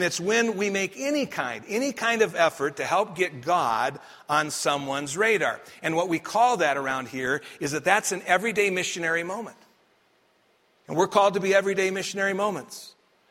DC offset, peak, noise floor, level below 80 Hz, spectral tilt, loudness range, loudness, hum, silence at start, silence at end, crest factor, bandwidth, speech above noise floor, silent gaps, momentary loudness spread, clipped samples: under 0.1%; -4 dBFS; -65 dBFS; -70 dBFS; -3.5 dB/octave; 2 LU; -25 LUFS; none; 0 s; 0.4 s; 22 dB; 16 kHz; 40 dB; none; 8 LU; under 0.1%